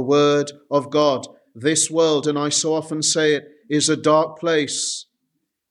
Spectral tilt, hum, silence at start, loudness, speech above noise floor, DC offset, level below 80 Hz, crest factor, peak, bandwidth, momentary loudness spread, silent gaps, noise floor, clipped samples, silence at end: -3 dB/octave; none; 0 s; -19 LUFS; 55 dB; under 0.1%; -70 dBFS; 16 dB; -4 dBFS; 12.5 kHz; 8 LU; none; -75 dBFS; under 0.1%; 0.7 s